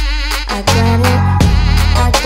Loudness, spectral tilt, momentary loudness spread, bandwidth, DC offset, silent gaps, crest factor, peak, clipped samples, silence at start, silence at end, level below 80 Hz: -12 LUFS; -5 dB/octave; 5 LU; 16.5 kHz; under 0.1%; none; 12 dB; 0 dBFS; under 0.1%; 0 s; 0 s; -16 dBFS